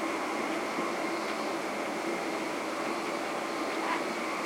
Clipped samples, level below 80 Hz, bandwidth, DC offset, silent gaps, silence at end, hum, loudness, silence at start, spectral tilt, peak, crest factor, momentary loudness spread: under 0.1%; -74 dBFS; 16.5 kHz; under 0.1%; none; 0 s; none; -33 LUFS; 0 s; -3 dB/octave; -18 dBFS; 14 dB; 2 LU